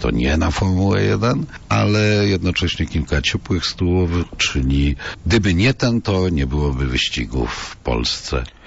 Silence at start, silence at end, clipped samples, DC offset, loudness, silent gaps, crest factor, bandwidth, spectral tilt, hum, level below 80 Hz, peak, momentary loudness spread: 0 s; 0 s; under 0.1%; under 0.1%; -19 LUFS; none; 12 dB; 8 kHz; -5.5 dB/octave; none; -28 dBFS; -6 dBFS; 6 LU